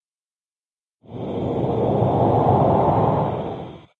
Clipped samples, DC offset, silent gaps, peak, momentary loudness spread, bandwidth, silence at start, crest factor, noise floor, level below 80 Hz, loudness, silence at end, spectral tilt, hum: under 0.1%; under 0.1%; none; -6 dBFS; 15 LU; 4.5 kHz; 1.1 s; 16 dB; under -90 dBFS; -46 dBFS; -20 LUFS; 0.2 s; -10.5 dB/octave; none